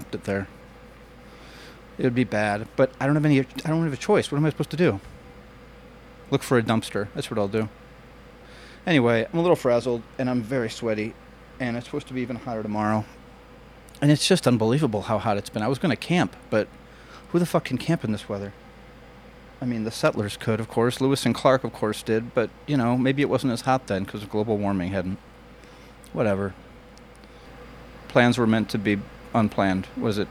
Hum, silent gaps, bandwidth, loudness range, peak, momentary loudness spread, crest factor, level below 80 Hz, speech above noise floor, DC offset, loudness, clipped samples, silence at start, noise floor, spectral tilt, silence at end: none; none; 16 kHz; 5 LU; -2 dBFS; 13 LU; 22 dB; -52 dBFS; 24 dB; under 0.1%; -24 LUFS; under 0.1%; 0 s; -47 dBFS; -6 dB/octave; 0 s